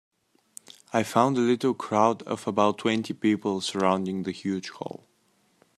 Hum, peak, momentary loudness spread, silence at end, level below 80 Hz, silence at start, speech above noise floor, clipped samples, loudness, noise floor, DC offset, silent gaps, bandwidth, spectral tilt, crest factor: none; -6 dBFS; 15 LU; 0.8 s; -72 dBFS; 0.95 s; 42 dB; under 0.1%; -26 LUFS; -67 dBFS; under 0.1%; none; 14 kHz; -5.5 dB/octave; 20 dB